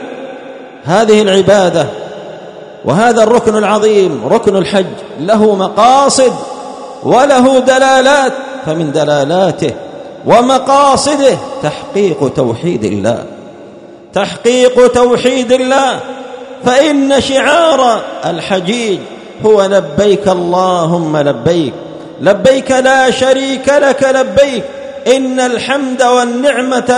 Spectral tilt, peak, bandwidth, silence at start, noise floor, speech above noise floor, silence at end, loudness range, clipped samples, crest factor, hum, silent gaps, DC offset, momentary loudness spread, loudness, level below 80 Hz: -4.5 dB/octave; 0 dBFS; 11 kHz; 0 s; -33 dBFS; 24 dB; 0 s; 2 LU; 0.7%; 10 dB; none; none; under 0.1%; 14 LU; -10 LUFS; -46 dBFS